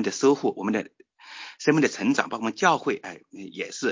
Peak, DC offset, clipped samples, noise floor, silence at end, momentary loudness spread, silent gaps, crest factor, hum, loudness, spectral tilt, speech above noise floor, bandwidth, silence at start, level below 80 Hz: -4 dBFS; under 0.1%; under 0.1%; -44 dBFS; 0 s; 18 LU; none; 20 dB; none; -25 LUFS; -4.5 dB/octave; 20 dB; 7.6 kHz; 0 s; -70 dBFS